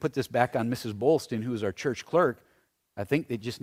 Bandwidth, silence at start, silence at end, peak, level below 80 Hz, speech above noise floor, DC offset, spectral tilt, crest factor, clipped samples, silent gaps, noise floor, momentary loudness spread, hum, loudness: 16 kHz; 0 s; 0.05 s; -6 dBFS; -64 dBFS; 41 dB; under 0.1%; -6 dB/octave; 22 dB; under 0.1%; none; -69 dBFS; 9 LU; none; -28 LUFS